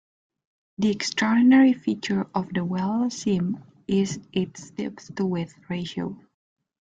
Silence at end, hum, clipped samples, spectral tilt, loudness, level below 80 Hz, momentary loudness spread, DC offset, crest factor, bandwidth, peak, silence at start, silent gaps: 0.65 s; none; under 0.1%; -5.5 dB/octave; -24 LUFS; -62 dBFS; 16 LU; under 0.1%; 16 dB; 9 kHz; -8 dBFS; 0.8 s; none